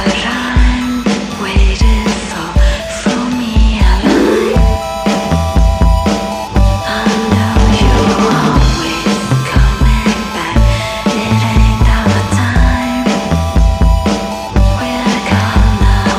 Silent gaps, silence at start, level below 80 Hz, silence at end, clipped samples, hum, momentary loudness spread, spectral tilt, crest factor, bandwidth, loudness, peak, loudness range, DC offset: none; 0 s; -14 dBFS; 0 s; under 0.1%; none; 5 LU; -5.5 dB/octave; 10 dB; 15 kHz; -12 LUFS; 0 dBFS; 1 LU; under 0.1%